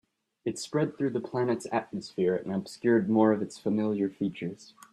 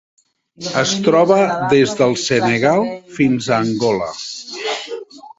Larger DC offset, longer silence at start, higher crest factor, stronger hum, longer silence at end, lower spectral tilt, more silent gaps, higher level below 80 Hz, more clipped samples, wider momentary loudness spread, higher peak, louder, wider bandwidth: neither; second, 0.45 s vs 0.6 s; about the same, 18 dB vs 16 dB; neither; first, 0.3 s vs 0.1 s; first, -6.5 dB/octave vs -4.5 dB/octave; neither; second, -70 dBFS vs -54 dBFS; neither; about the same, 13 LU vs 12 LU; second, -10 dBFS vs -2 dBFS; second, -29 LUFS vs -16 LUFS; first, 12.5 kHz vs 8 kHz